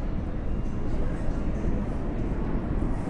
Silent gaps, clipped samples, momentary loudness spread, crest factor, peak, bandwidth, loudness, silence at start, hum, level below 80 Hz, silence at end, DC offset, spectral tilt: none; under 0.1%; 3 LU; 12 dB; -14 dBFS; 6.6 kHz; -31 LUFS; 0 s; none; -30 dBFS; 0 s; under 0.1%; -9 dB/octave